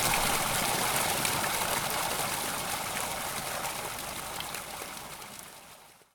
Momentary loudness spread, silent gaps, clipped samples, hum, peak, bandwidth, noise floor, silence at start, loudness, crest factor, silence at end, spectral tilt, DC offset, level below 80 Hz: 15 LU; none; under 0.1%; none; -12 dBFS; 19.5 kHz; -54 dBFS; 0 s; -30 LUFS; 20 dB; 0.2 s; -1.5 dB/octave; under 0.1%; -52 dBFS